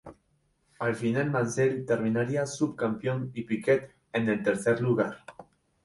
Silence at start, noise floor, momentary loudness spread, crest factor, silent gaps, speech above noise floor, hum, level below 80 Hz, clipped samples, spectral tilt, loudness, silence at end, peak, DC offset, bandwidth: 0.05 s; -71 dBFS; 7 LU; 18 dB; none; 43 dB; none; -64 dBFS; under 0.1%; -6.5 dB/octave; -28 LUFS; 0.4 s; -12 dBFS; under 0.1%; 11.5 kHz